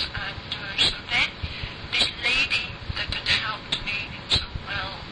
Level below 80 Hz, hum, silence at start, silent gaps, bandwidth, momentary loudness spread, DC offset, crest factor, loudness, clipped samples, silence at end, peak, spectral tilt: -42 dBFS; none; 0 s; none; 10.5 kHz; 10 LU; under 0.1%; 18 dB; -24 LUFS; under 0.1%; 0 s; -8 dBFS; -2.5 dB/octave